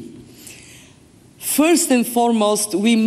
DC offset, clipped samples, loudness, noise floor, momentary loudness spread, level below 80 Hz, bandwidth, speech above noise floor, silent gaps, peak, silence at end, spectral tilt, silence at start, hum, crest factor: under 0.1%; under 0.1%; -17 LUFS; -48 dBFS; 24 LU; -60 dBFS; 15 kHz; 32 dB; none; -6 dBFS; 0 s; -3.5 dB/octave; 0 s; none; 14 dB